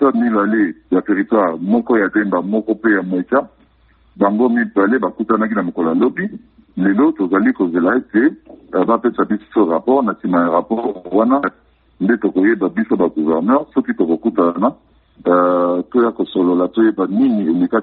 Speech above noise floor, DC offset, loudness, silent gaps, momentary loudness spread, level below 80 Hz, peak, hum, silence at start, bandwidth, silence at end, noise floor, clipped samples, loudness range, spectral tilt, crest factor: 37 dB; under 0.1%; -16 LUFS; none; 5 LU; -56 dBFS; -2 dBFS; none; 0 s; 4.2 kHz; 0 s; -53 dBFS; under 0.1%; 1 LU; -6.5 dB/octave; 14 dB